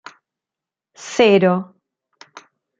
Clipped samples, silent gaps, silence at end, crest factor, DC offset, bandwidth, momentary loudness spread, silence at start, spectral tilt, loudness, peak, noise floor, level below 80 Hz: under 0.1%; none; 1.15 s; 18 dB; under 0.1%; 7.8 kHz; 24 LU; 1 s; -5.5 dB/octave; -16 LUFS; -2 dBFS; -87 dBFS; -64 dBFS